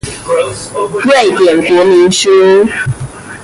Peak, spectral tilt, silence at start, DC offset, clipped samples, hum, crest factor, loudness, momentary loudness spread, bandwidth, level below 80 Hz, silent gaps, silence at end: 0 dBFS; -4.5 dB/octave; 0.05 s; under 0.1%; under 0.1%; none; 10 dB; -9 LUFS; 11 LU; 11.5 kHz; -40 dBFS; none; 0 s